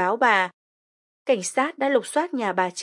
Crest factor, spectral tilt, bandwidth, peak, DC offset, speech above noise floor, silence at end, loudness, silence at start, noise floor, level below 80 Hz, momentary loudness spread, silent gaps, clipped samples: 18 dB; -3 dB/octave; 11.5 kHz; -4 dBFS; under 0.1%; over 68 dB; 0 s; -23 LUFS; 0 s; under -90 dBFS; -86 dBFS; 7 LU; 0.54-1.25 s; under 0.1%